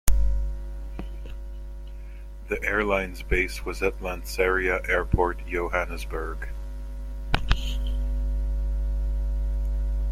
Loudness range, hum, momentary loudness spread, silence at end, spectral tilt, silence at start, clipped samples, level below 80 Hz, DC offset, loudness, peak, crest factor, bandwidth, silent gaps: 5 LU; none; 15 LU; 0 s; -5.5 dB/octave; 0.05 s; under 0.1%; -28 dBFS; under 0.1%; -28 LUFS; -2 dBFS; 24 dB; 16.5 kHz; none